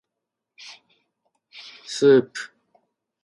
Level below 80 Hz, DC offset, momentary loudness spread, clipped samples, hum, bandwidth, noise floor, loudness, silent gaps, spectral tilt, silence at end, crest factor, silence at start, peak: -76 dBFS; under 0.1%; 26 LU; under 0.1%; none; 11.5 kHz; -84 dBFS; -19 LUFS; none; -5 dB/octave; 0.75 s; 20 dB; 0.65 s; -4 dBFS